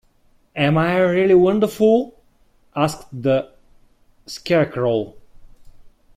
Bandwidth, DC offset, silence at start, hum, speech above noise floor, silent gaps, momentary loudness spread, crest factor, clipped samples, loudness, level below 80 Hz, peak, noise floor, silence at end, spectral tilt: 15.5 kHz; under 0.1%; 0.55 s; none; 40 dB; none; 19 LU; 16 dB; under 0.1%; -18 LUFS; -52 dBFS; -4 dBFS; -57 dBFS; 0.3 s; -6.5 dB/octave